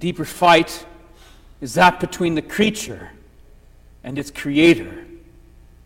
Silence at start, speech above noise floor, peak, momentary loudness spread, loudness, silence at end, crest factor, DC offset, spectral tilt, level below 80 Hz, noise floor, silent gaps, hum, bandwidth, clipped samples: 0 s; 29 dB; -2 dBFS; 21 LU; -18 LUFS; 0.7 s; 18 dB; under 0.1%; -4.5 dB/octave; -46 dBFS; -47 dBFS; none; 60 Hz at -45 dBFS; 16.5 kHz; under 0.1%